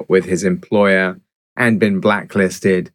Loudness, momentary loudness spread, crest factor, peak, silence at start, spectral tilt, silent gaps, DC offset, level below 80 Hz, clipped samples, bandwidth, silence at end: -16 LUFS; 5 LU; 14 dB; -2 dBFS; 0 s; -6 dB/octave; 1.35-1.56 s; under 0.1%; -58 dBFS; under 0.1%; 14.5 kHz; 0.1 s